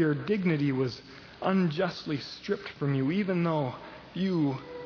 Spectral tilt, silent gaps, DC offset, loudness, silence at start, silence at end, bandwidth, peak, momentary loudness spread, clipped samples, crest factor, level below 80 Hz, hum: -8 dB/octave; none; under 0.1%; -30 LUFS; 0 s; 0 s; 5.4 kHz; -12 dBFS; 8 LU; under 0.1%; 16 dB; -64 dBFS; none